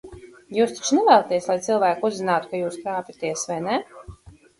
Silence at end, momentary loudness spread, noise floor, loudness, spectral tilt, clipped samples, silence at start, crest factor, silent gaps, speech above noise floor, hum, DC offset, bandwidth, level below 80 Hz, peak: 0.3 s; 12 LU; -45 dBFS; -22 LUFS; -4 dB/octave; under 0.1%; 0.05 s; 20 dB; none; 24 dB; none; under 0.1%; 11.5 kHz; -56 dBFS; -2 dBFS